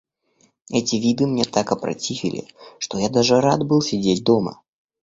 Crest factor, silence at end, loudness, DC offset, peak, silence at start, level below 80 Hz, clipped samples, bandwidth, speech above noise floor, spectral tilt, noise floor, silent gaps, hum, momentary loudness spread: 20 dB; 0.5 s; -20 LUFS; under 0.1%; -2 dBFS; 0.7 s; -56 dBFS; under 0.1%; 8 kHz; 42 dB; -5 dB/octave; -62 dBFS; none; none; 11 LU